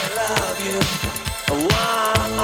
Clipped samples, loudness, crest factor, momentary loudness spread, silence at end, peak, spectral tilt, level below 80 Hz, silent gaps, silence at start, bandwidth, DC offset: under 0.1%; -20 LUFS; 18 dB; 6 LU; 0 s; -2 dBFS; -3.5 dB/octave; -36 dBFS; none; 0 s; 19.5 kHz; under 0.1%